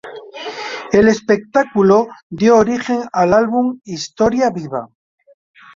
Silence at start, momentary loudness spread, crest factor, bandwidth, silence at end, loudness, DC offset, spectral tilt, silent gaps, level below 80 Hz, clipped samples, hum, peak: 0.05 s; 14 LU; 16 dB; 7.6 kHz; 0.9 s; -15 LUFS; under 0.1%; -5.5 dB/octave; 2.23-2.30 s; -48 dBFS; under 0.1%; none; 0 dBFS